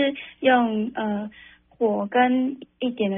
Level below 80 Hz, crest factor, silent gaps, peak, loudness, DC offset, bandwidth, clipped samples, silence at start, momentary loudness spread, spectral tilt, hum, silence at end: -64 dBFS; 16 dB; none; -6 dBFS; -23 LUFS; under 0.1%; 3.8 kHz; under 0.1%; 0 s; 10 LU; -3.5 dB/octave; none; 0 s